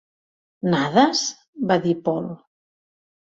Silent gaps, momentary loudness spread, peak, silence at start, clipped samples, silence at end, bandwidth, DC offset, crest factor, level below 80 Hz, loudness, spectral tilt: 1.48-1.53 s; 12 LU; -2 dBFS; 0.65 s; under 0.1%; 0.9 s; 7.8 kHz; under 0.1%; 20 dB; -64 dBFS; -21 LUFS; -4.5 dB/octave